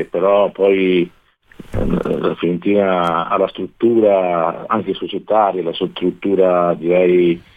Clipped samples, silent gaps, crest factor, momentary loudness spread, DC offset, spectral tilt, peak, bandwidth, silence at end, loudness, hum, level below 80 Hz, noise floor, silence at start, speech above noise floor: under 0.1%; none; 14 dB; 7 LU; under 0.1%; -8.5 dB/octave; -2 dBFS; 4.8 kHz; 0.2 s; -16 LUFS; none; -38 dBFS; -41 dBFS; 0 s; 25 dB